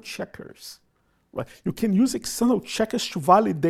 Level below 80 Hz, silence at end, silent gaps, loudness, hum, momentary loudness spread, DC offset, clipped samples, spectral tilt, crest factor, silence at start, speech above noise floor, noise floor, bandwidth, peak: -56 dBFS; 0 s; none; -23 LUFS; none; 21 LU; under 0.1%; under 0.1%; -5 dB/octave; 20 dB; 0.05 s; 37 dB; -60 dBFS; 15 kHz; -4 dBFS